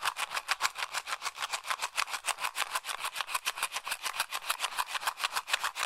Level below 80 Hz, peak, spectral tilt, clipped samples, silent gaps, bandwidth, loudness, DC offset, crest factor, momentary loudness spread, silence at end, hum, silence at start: -72 dBFS; -8 dBFS; 2.5 dB/octave; under 0.1%; none; 16 kHz; -33 LUFS; under 0.1%; 26 dB; 4 LU; 0 s; none; 0 s